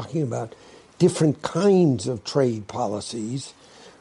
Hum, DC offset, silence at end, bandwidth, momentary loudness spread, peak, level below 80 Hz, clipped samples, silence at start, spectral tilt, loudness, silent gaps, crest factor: none; under 0.1%; 0.1 s; 11.5 kHz; 13 LU; -6 dBFS; -62 dBFS; under 0.1%; 0 s; -6.5 dB/octave; -23 LUFS; none; 18 dB